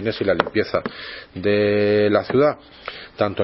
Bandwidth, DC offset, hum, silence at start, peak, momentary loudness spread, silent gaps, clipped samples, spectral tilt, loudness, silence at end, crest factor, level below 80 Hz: 5.8 kHz; under 0.1%; none; 0 s; 0 dBFS; 16 LU; none; under 0.1%; -9.5 dB/octave; -20 LUFS; 0 s; 20 dB; -54 dBFS